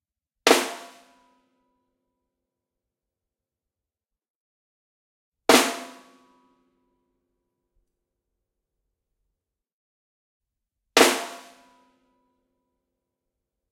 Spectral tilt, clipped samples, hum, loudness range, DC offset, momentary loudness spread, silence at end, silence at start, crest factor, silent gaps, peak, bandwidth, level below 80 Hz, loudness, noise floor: -1 dB/octave; under 0.1%; none; 2 LU; under 0.1%; 20 LU; 2.35 s; 0.45 s; 28 dB; 4.30-5.32 s, 9.73-10.40 s; -2 dBFS; 16.5 kHz; -70 dBFS; -20 LUFS; -89 dBFS